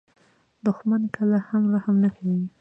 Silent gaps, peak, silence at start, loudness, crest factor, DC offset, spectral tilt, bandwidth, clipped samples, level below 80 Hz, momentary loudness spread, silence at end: none; -10 dBFS; 0.65 s; -23 LUFS; 14 dB; under 0.1%; -10.5 dB/octave; 3.2 kHz; under 0.1%; -68 dBFS; 5 LU; 0.1 s